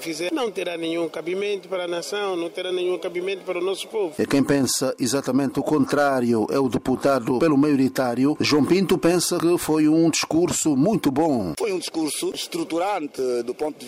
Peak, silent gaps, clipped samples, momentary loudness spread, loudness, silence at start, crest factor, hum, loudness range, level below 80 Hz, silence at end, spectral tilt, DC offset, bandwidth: -10 dBFS; none; under 0.1%; 8 LU; -22 LUFS; 0 s; 12 dB; none; 6 LU; -56 dBFS; 0 s; -4.5 dB/octave; under 0.1%; 16 kHz